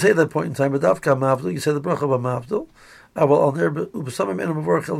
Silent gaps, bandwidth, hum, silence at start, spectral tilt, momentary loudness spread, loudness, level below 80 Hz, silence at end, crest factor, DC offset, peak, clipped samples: none; 14.5 kHz; none; 0 s; -6.5 dB/octave; 10 LU; -21 LUFS; -60 dBFS; 0 s; 16 dB; under 0.1%; -4 dBFS; under 0.1%